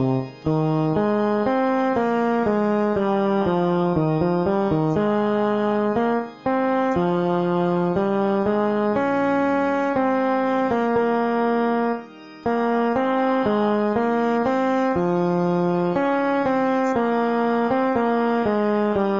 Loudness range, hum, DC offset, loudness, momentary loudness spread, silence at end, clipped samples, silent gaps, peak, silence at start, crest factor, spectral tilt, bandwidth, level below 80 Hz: 1 LU; none; 0.2%; -21 LUFS; 1 LU; 0 s; under 0.1%; none; -8 dBFS; 0 s; 14 dB; -8.5 dB/octave; 7.6 kHz; -54 dBFS